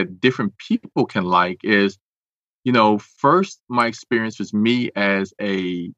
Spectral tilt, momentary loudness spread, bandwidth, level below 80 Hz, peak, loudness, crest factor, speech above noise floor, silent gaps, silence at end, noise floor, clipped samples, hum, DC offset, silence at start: -6 dB/octave; 7 LU; 9.4 kHz; -66 dBFS; -2 dBFS; -20 LUFS; 18 dB; over 70 dB; 2.01-2.63 s, 3.60-3.67 s; 0.05 s; under -90 dBFS; under 0.1%; none; under 0.1%; 0 s